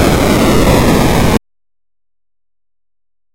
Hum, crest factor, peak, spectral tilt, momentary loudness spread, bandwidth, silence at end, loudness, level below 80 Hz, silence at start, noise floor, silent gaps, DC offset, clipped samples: none; 12 dB; 0 dBFS; -5.5 dB/octave; 4 LU; 17 kHz; 1.95 s; -10 LUFS; -22 dBFS; 0 s; under -90 dBFS; none; under 0.1%; under 0.1%